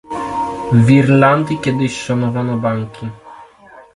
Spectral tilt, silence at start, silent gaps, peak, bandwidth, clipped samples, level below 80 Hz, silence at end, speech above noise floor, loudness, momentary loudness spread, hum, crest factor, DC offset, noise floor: -7.5 dB/octave; 0.1 s; none; 0 dBFS; 11.5 kHz; under 0.1%; -48 dBFS; 0.15 s; 29 dB; -15 LUFS; 13 LU; none; 16 dB; under 0.1%; -42 dBFS